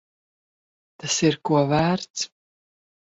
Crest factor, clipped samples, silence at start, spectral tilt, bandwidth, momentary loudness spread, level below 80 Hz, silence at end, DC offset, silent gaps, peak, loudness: 18 dB; under 0.1%; 1.05 s; -4.5 dB/octave; 8 kHz; 11 LU; -56 dBFS; 0.9 s; under 0.1%; 2.10-2.14 s; -6 dBFS; -23 LUFS